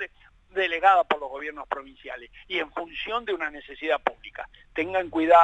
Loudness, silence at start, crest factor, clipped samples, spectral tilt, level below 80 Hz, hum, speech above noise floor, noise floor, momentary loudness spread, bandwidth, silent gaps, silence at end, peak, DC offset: -26 LUFS; 0 s; 20 dB; under 0.1%; -4.5 dB/octave; -58 dBFS; none; 29 dB; -54 dBFS; 20 LU; 8 kHz; none; 0 s; -4 dBFS; under 0.1%